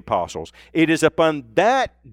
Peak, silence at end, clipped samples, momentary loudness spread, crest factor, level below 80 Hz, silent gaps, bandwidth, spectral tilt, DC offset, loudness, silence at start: -4 dBFS; 0.25 s; under 0.1%; 11 LU; 16 dB; -50 dBFS; none; 14 kHz; -5 dB/octave; under 0.1%; -19 LUFS; 0.05 s